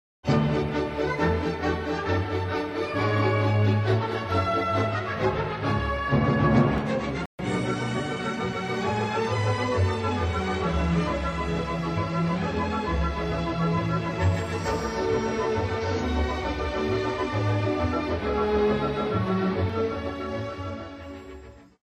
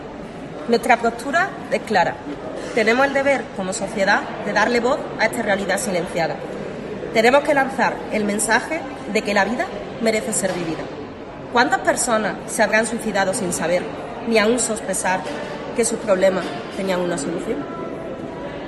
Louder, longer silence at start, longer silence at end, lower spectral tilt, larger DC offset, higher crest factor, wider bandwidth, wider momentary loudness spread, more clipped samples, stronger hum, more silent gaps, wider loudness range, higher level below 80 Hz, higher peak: second, -26 LUFS vs -20 LUFS; first, 0.25 s vs 0 s; first, 0.35 s vs 0 s; first, -7 dB/octave vs -3.5 dB/octave; neither; about the same, 16 dB vs 20 dB; second, 10 kHz vs 12.5 kHz; second, 6 LU vs 13 LU; neither; neither; first, 7.26-7.38 s vs none; about the same, 2 LU vs 2 LU; first, -38 dBFS vs -50 dBFS; second, -8 dBFS vs -2 dBFS